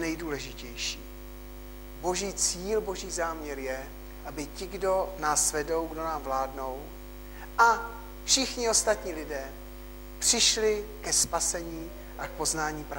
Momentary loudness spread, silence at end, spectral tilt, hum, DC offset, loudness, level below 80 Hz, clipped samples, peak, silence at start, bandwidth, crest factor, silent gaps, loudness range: 21 LU; 0 s; -1.5 dB/octave; 50 Hz at -45 dBFS; under 0.1%; -28 LUFS; -44 dBFS; under 0.1%; -8 dBFS; 0 s; 16.5 kHz; 22 dB; none; 6 LU